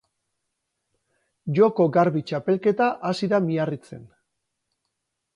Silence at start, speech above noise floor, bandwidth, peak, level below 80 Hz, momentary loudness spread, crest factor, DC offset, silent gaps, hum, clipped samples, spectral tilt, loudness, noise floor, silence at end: 1.45 s; 58 dB; 11 kHz; -6 dBFS; -70 dBFS; 9 LU; 18 dB; under 0.1%; none; none; under 0.1%; -7.5 dB/octave; -22 LUFS; -79 dBFS; 1.3 s